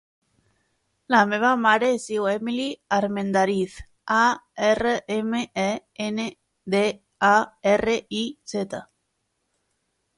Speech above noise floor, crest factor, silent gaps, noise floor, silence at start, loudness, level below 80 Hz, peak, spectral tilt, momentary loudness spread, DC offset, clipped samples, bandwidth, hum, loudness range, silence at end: 52 dB; 20 dB; none; -75 dBFS; 1.1 s; -23 LUFS; -56 dBFS; -4 dBFS; -4.5 dB/octave; 11 LU; under 0.1%; under 0.1%; 11.5 kHz; none; 2 LU; 1.35 s